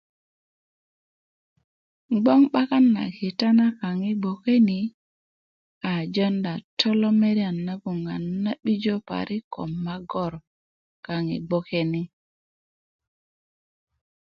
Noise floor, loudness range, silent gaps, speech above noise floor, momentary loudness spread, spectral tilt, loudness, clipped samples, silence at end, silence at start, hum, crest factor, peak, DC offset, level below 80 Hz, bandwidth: under -90 dBFS; 9 LU; 4.94-5.81 s, 6.64-6.77 s, 9.44-9.51 s, 10.47-11.03 s; over 67 dB; 12 LU; -7.5 dB/octave; -24 LUFS; under 0.1%; 2.25 s; 2.1 s; none; 20 dB; -4 dBFS; under 0.1%; -64 dBFS; 7 kHz